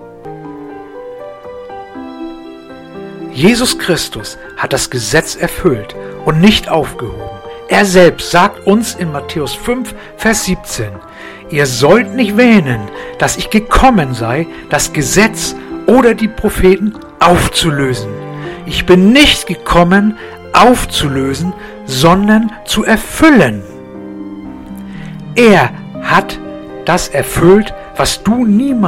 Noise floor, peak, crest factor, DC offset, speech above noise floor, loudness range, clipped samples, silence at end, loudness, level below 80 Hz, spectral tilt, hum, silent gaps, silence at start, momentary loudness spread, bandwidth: -31 dBFS; 0 dBFS; 12 dB; under 0.1%; 20 dB; 6 LU; 0.7%; 0 s; -11 LUFS; -30 dBFS; -4.5 dB/octave; none; none; 0 s; 20 LU; 17 kHz